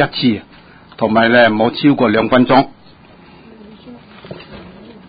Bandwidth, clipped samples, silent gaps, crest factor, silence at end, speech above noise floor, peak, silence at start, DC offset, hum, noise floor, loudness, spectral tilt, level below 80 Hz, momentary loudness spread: 5 kHz; under 0.1%; none; 16 dB; 0.4 s; 30 dB; 0 dBFS; 0 s; under 0.1%; none; -42 dBFS; -13 LUFS; -9.5 dB/octave; -48 dBFS; 24 LU